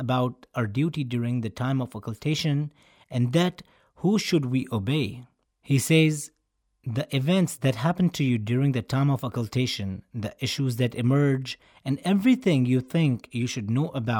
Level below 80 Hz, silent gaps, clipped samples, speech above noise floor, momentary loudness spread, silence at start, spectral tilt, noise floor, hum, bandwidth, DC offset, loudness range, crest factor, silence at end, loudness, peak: -62 dBFS; none; under 0.1%; 47 dB; 11 LU; 0 s; -6 dB/octave; -72 dBFS; none; 19 kHz; under 0.1%; 3 LU; 18 dB; 0 s; -26 LUFS; -8 dBFS